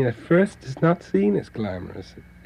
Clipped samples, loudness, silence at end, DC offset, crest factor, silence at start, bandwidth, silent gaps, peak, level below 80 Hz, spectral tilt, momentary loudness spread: under 0.1%; -23 LUFS; 0.25 s; under 0.1%; 16 dB; 0 s; 10.5 kHz; none; -6 dBFS; -52 dBFS; -8.5 dB/octave; 14 LU